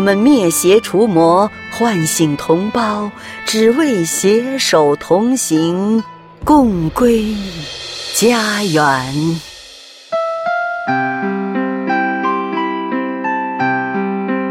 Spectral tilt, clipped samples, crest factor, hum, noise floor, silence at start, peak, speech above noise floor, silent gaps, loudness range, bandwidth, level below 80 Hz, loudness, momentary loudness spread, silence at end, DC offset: -4.5 dB/octave; under 0.1%; 14 dB; none; -38 dBFS; 0 s; 0 dBFS; 25 dB; none; 4 LU; 16.5 kHz; -42 dBFS; -15 LUFS; 10 LU; 0 s; under 0.1%